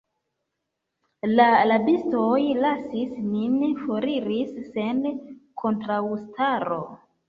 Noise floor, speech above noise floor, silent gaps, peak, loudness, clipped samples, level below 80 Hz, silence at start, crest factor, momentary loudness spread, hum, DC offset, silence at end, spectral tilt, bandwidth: -81 dBFS; 58 dB; none; -4 dBFS; -24 LUFS; under 0.1%; -64 dBFS; 1.25 s; 20 dB; 12 LU; none; under 0.1%; 0.35 s; -8 dB/octave; 5 kHz